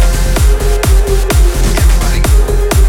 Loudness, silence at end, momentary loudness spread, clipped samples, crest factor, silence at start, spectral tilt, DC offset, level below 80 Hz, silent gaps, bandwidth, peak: -12 LUFS; 0 s; 1 LU; under 0.1%; 8 dB; 0 s; -5 dB/octave; under 0.1%; -8 dBFS; none; 17 kHz; 0 dBFS